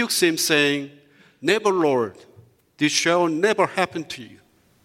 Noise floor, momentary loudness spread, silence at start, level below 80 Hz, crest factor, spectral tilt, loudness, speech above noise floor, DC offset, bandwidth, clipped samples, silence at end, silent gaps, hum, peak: -53 dBFS; 13 LU; 0 s; -70 dBFS; 20 dB; -3 dB/octave; -21 LUFS; 32 dB; under 0.1%; 16.5 kHz; under 0.1%; 0.55 s; none; none; -4 dBFS